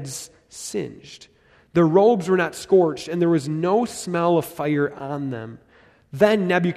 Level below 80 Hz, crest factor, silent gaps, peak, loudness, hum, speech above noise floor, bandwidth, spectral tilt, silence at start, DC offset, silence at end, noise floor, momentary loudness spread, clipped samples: -60 dBFS; 18 dB; none; -4 dBFS; -21 LUFS; none; 27 dB; 14 kHz; -6 dB/octave; 0 s; under 0.1%; 0 s; -48 dBFS; 17 LU; under 0.1%